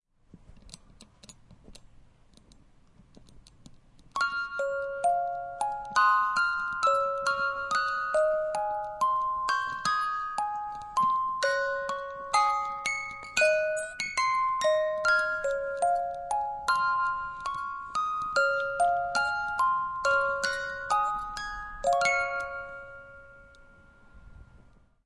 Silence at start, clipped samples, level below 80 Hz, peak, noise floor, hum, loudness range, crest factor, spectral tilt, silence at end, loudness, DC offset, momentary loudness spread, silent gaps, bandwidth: 0.35 s; under 0.1%; -58 dBFS; -10 dBFS; -58 dBFS; none; 6 LU; 20 dB; -1.5 dB/octave; 0.5 s; -28 LUFS; under 0.1%; 9 LU; none; 11.5 kHz